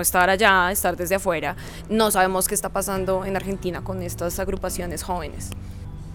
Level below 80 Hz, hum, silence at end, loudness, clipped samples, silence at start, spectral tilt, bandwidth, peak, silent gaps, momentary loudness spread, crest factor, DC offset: -38 dBFS; none; 0 s; -22 LUFS; under 0.1%; 0 s; -3.5 dB/octave; over 20 kHz; -4 dBFS; none; 17 LU; 20 dB; under 0.1%